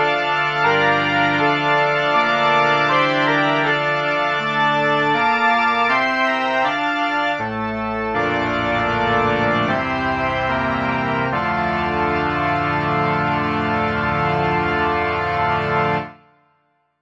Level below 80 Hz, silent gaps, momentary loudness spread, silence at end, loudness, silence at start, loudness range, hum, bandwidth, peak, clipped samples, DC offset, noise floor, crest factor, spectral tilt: -44 dBFS; none; 4 LU; 0.85 s; -18 LUFS; 0 s; 3 LU; none; 9.2 kHz; -4 dBFS; under 0.1%; under 0.1%; -64 dBFS; 14 dB; -6 dB/octave